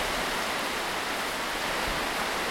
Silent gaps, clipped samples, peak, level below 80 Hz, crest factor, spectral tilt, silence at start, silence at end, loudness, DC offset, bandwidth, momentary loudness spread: none; under 0.1%; -16 dBFS; -48 dBFS; 14 dB; -2 dB/octave; 0 s; 0 s; -29 LUFS; under 0.1%; 16.5 kHz; 1 LU